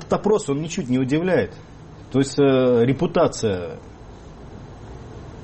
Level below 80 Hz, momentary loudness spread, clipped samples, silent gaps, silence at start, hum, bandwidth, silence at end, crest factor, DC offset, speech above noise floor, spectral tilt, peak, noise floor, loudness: -46 dBFS; 24 LU; under 0.1%; none; 0 s; none; 8.8 kHz; 0 s; 14 dB; under 0.1%; 20 dB; -6 dB/octave; -6 dBFS; -40 dBFS; -20 LUFS